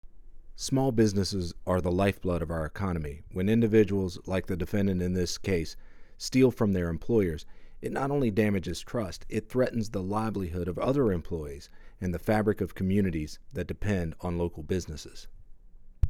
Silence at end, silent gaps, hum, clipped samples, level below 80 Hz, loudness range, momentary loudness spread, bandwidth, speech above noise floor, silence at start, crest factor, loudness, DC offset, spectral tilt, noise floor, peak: 0 s; none; none; under 0.1%; -44 dBFS; 3 LU; 12 LU; 17 kHz; 20 dB; 0.05 s; 20 dB; -29 LUFS; under 0.1%; -6.5 dB/octave; -48 dBFS; -10 dBFS